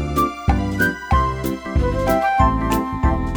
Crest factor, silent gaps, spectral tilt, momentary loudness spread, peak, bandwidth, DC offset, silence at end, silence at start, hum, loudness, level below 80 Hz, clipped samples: 16 dB; none; -6.5 dB/octave; 5 LU; -2 dBFS; over 20 kHz; under 0.1%; 0 s; 0 s; none; -19 LUFS; -24 dBFS; under 0.1%